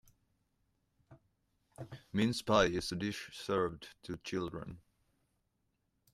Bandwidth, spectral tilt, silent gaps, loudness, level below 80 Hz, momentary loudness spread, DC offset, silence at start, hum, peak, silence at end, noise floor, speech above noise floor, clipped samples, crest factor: 14.5 kHz; -5 dB/octave; none; -35 LUFS; -62 dBFS; 21 LU; under 0.1%; 1.1 s; none; -14 dBFS; 1.35 s; -81 dBFS; 46 dB; under 0.1%; 26 dB